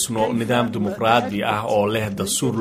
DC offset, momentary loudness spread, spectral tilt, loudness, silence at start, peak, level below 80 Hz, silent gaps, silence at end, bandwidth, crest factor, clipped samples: under 0.1%; 4 LU; -4.5 dB/octave; -21 LUFS; 0 s; -2 dBFS; -52 dBFS; none; 0 s; 16 kHz; 20 dB; under 0.1%